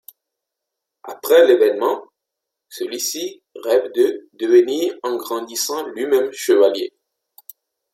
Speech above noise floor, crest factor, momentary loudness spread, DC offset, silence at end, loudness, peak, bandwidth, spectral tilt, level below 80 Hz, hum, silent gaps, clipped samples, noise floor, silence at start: 64 dB; 18 dB; 16 LU; under 0.1%; 1.05 s; -18 LUFS; -2 dBFS; 16.5 kHz; -2 dB/octave; -76 dBFS; none; none; under 0.1%; -82 dBFS; 1.05 s